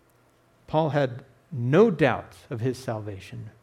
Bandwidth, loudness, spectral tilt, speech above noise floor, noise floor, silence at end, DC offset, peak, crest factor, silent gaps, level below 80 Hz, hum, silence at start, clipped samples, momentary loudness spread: 13.5 kHz; -25 LUFS; -7.5 dB/octave; 37 dB; -61 dBFS; 0.15 s; under 0.1%; -8 dBFS; 18 dB; none; -62 dBFS; none; 0.7 s; under 0.1%; 19 LU